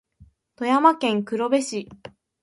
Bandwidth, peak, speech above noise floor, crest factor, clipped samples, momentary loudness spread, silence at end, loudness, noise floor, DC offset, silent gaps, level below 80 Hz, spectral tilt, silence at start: 11.5 kHz; -4 dBFS; 34 dB; 20 dB; under 0.1%; 14 LU; 0.35 s; -22 LUFS; -55 dBFS; under 0.1%; none; -64 dBFS; -4.5 dB/octave; 0.2 s